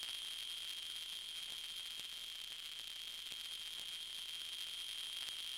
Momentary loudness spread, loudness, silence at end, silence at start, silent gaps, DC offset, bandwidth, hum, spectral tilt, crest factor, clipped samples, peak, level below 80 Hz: 3 LU; -44 LUFS; 0 s; 0 s; none; under 0.1%; 17 kHz; none; 2 dB/octave; 24 dB; under 0.1%; -22 dBFS; -78 dBFS